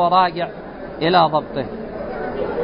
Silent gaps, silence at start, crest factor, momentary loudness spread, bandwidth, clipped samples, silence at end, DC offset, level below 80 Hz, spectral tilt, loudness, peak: none; 0 s; 18 dB; 13 LU; 5.4 kHz; under 0.1%; 0 s; under 0.1%; -46 dBFS; -10.5 dB/octave; -20 LUFS; -2 dBFS